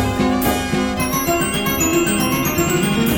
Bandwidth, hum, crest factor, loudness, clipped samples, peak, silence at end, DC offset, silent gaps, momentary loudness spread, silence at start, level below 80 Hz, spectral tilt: over 20 kHz; none; 14 dB; -17 LUFS; under 0.1%; -4 dBFS; 0 s; under 0.1%; none; 3 LU; 0 s; -34 dBFS; -4 dB/octave